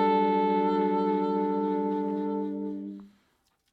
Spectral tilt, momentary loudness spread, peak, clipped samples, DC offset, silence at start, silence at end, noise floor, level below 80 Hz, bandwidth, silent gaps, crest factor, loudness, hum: -9 dB/octave; 12 LU; -14 dBFS; under 0.1%; under 0.1%; 0 s; 0.65 s; -71 dBFS; -76 dBFS; 5.2 kHz; none; 14 dB; -27 LUFS; none